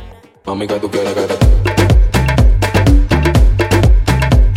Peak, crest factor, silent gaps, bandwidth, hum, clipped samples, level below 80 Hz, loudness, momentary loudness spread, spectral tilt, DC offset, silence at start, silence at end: 0 dBFS; 10 dB; none; 15.5 kHz; none; under 0.1%; -12 dBFS; -13 LUFS; 7 LU; -6.5 dB/octave; under 0.1%; 0 s; 0 s